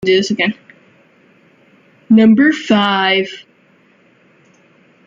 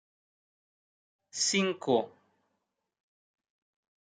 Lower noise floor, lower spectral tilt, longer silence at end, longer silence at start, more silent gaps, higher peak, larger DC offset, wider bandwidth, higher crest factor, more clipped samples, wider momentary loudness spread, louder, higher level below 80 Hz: second, -52 dBFS vs -83 dBFS; first, -5.5 dB/octave vs -3 dB/octave; second, 1.65 s vs 1.95 s; second, 0 s vs 1.35 s; neither; first, -2 dBFS vs -14 dBFS; neither; second, 7.6 kHz vs 10 kHz; second, 14 dB vs 22 dB; neither; about the same, 15 LU vs 15 LU; first, -13 LUFS vs -29 LUFS; first, -58 dBFS vs -86 dBFS